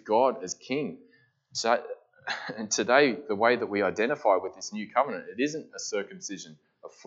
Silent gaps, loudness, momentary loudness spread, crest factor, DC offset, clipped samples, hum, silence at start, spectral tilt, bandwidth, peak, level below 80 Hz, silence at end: none; -28 LUFS; 14 LU; 22 dB; under 0.1%; under 0.1%; none; 0.05 s; -3 dB/octave; 8 kHz; -6 dBFS; -82 dBFS; 0.2 s